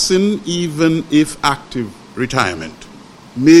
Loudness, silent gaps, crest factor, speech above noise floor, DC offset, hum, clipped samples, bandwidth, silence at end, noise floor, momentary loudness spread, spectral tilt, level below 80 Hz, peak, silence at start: -16 LUFS; none; 16 dB; 22 dB; under 0.1%; none; under 0.1%; 13 kHz; 0 s; -39 dBFS; 14 LU; -4.5 dB/octave; -44 dBFS; 0 dBFS; 0 s